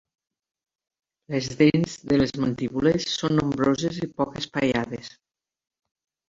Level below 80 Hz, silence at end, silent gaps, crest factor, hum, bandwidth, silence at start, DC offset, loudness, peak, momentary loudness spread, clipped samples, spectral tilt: -52 dBFS; 1.2 s; none; 20 dB; none; 7.8 kHz; 1.3 s; under 0.1%; -24 LUFS; -6 dBFS; 9 LU; under 0.1%; -6 dB/octave